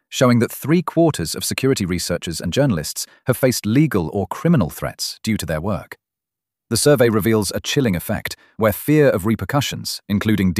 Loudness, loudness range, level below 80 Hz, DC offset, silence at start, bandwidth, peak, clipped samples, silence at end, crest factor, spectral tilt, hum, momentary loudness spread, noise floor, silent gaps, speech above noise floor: -19 LUFS; 2 LU; -44 dBFS; under 0.1%; 0.1 s; 15.5 kHz; -2 dBFS; under 0.1%; 0 s; 16 dB; -5 dB/octave; none; 9 LU; -86 dBFS; none; 68 dB